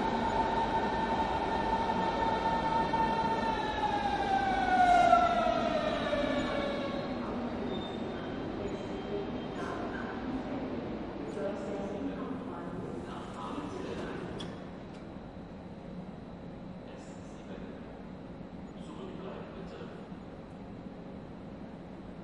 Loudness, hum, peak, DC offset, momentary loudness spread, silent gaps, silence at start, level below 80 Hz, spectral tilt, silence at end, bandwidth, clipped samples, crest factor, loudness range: -33 LUFS; none; -10 dBFS; under 0.1%; 16 LU; none; 0 s; -52 dBFS; -6 dB/octave; 0 s; 11 kHz; under 0.1%; 24 dB; 17 LU